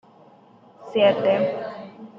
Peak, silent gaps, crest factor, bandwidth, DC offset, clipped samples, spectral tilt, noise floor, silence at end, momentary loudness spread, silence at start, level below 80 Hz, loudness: -6 dBFS; none; 18 dB; 5.8 kHz; under 0.1%; under 0.1%; -7 dB/octave; -52 dBFS; 0 s; 16 LU; 0.8 s; -72 dBFS; -21 LUFS